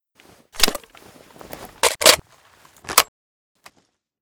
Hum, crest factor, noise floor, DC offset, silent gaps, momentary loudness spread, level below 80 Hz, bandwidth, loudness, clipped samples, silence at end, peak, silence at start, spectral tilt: none; 24 dB; -65 dBFS; under 0.1%; none; 24 LU; -46 dBFS; over 20 kHz; -17 LUFS; under 0.1%; 1.2 s; 0 dBFS; 0.55 s; 0 dB/octave